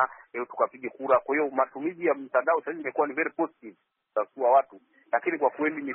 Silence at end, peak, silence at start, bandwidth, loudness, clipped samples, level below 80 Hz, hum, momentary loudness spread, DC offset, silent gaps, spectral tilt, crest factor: 0 s; -10 dBFS; 0 s; 3.9 kHz; -27 LUFS; under 0.1%; -80 dBFS; none; 9 LU; under 0.1%; none; 2 dB/octave; 18 dB